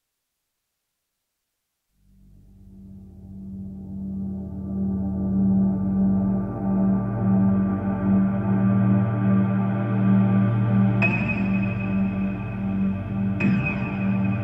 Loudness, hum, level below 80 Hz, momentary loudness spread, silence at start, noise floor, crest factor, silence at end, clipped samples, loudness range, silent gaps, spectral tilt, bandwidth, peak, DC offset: -23 LUFS; none; -44 dBFS; 11 LU; 2.7 s; -79 dBFS; 14 dB; 0 s; under 0.1%; 13 LU; none; -10.5 dB/octave; 3.6 kHz; -10 dBFS; under 0.1%